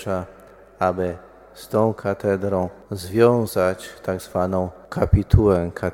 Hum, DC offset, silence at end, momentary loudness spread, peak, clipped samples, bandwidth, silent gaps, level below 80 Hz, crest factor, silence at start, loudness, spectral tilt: none; under 0.1%; 0 s; 12 LU; 0 dBFS; under 0.1%; 17 kHz; none; -34 dBFS; 22 dB; 0 s; -22 LUFS; -7.5 dB/octave